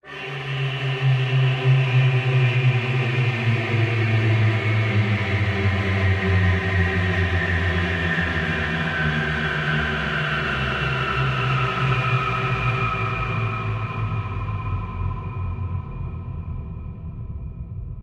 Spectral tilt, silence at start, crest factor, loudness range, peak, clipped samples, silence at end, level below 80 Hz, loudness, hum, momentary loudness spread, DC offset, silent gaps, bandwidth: -7 dB/octave; 0.05 s; 14 dB; 8 LU; -8 dBFS; under 0.1%; 0 s; -38 dBFS; -22 LUFS; none; 12 LU; under 0.1%; none; 7.8 kHz